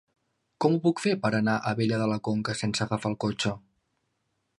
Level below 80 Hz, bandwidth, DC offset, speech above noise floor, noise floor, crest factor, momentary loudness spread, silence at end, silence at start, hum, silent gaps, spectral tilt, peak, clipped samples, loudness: -60 dBFS; 11.5 kHz; under 0.1%; 50 dB; -77 dBFS; 20 dB; 5 LU; 1 s; 0.6 s; none; none; -5.5 dB/octave; -8 dBFS; under 0.1%; -27 LUFS